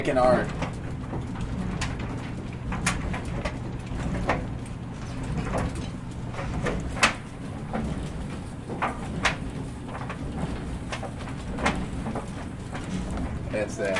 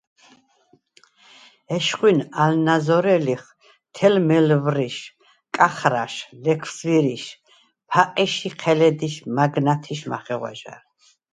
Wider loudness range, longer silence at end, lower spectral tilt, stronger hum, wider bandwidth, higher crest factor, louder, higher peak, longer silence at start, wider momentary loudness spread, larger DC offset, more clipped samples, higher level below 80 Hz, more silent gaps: about the same, 3 LU vs 3 LU; second, 0 s vs 0.55 s; about the same, -5.5 dB/octave vs -5.5 dB/octave; neither; about the same, 11.5 kHz vs 10.5 kHz; about the same, 24 dB vs 22 dB; second, -30 LUFS vs -20 LUFS; second, -4 dBFS vs 0 dBFS; second, 0 s vs 1.7 s; about the same, 11 LU vs 12 LU; neither; neither; first, -38 dBFS vs -68 dBFS; neither